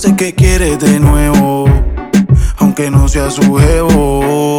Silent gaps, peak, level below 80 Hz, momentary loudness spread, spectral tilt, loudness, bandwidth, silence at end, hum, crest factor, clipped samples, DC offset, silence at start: none; 0 dBFS; -16 dBFS; 3 LU; -6.5 dB/octave; -10 LUFS; 17 kHz; 0 s; none; 8 dB; under 0.1%; under 0.1%; 0 s